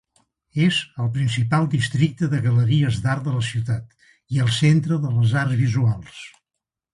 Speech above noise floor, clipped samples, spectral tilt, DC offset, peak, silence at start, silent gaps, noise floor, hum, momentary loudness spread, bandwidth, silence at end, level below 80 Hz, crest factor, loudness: 64 dB; under 0.1%; -6 dB/octave; under 0.1%; -6 dBFS; 0.55 s; none; -84 dBFS; none; 9 LU; 11.5 kHz; 0.65 s; -50 dBFS; 14 dB; -21 LUFS